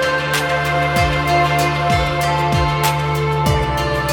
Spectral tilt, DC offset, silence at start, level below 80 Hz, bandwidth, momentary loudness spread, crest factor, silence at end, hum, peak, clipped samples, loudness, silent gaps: -5 dB/octave; under 0.1%; 0 s; -30 dBFS; 19 kHz; 3 LU; 14 dB; 0 s; none; -4 dBFS; under 0.1%; -17 LUFS; none